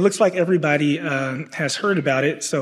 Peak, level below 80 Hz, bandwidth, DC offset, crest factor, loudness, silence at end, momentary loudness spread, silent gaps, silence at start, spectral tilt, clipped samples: -2 dBFS; -72 dBFS; 13.5 kHz; under 0.1%; 18 dB; -20 LUFS; 0 s; 6 LU; none; 0 s; -5 dB/octave; under 0.1%